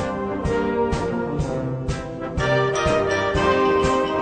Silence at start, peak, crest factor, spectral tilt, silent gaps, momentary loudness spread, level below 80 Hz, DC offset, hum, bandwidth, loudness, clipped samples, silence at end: 0 s; -6 dBFS; 16 dB; -6 dB/octave; none; 8 LU; -36 dBFS; under 0.1%; none; 9.4 kHz; -22 LUFS; under 0.1%; 0 s